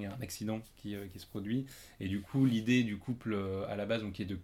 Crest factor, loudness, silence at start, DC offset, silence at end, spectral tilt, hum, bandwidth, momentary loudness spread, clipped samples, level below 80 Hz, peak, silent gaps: 18 dB; -36 LUFS; 0 s; under 0.1%; 0 s; -6.5 dB/octave; none; 16.5 kHz; 13 LU; under 0.1%; -62 dBFS; -18 dBFS; none